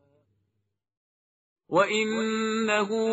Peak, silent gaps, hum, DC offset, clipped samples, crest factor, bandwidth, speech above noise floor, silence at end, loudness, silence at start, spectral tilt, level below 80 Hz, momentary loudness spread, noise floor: -8 dBFS; none; none; under 0.1%; under 0.1%; 20 dB; 8 kHz; 54 dB; 0 s; -25 LUFS; 1.7 s; -2.5 dB/octave; -74 dBFS; 4 LU; -79 dBFS